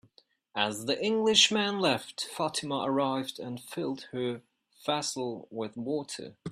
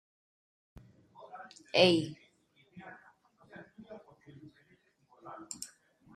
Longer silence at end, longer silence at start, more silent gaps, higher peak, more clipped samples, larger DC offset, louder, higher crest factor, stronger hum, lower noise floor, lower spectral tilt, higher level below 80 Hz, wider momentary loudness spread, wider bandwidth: second, 0 s vs 0.5 s; second, 0.55 s vs 1.35 s; neither; about the same, -8 dBFS vs -10 dBFS; neither; neither; about the same, -30 LUFS vs -30 LUFS; about the same, 24 dB vs 28 dB; neither; second, -65 dBFS vs -69 dBFS; second, -3 dB/octave vs -4.5 dB/octave; about the same, -72 dBFS vs -72 dBFS; second, 15 LU vs 29 LU; first, 14.5 kHz vs 13 kHz